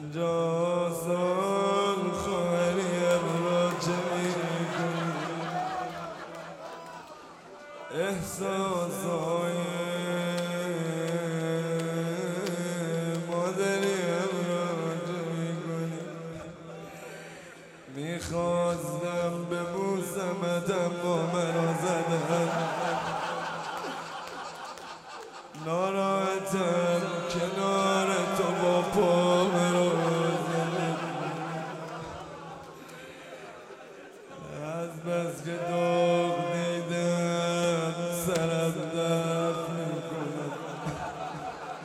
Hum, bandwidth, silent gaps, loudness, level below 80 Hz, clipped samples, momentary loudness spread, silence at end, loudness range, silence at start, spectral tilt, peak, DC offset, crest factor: none; 15.5 kHz; none; -29 LUFS; -64 dBFS; under 0.1%; 17 LU; 0 s; 9 LU; 0 s; -5.5 dB/octave; -10 dBFS; under 0.1%; 18 dB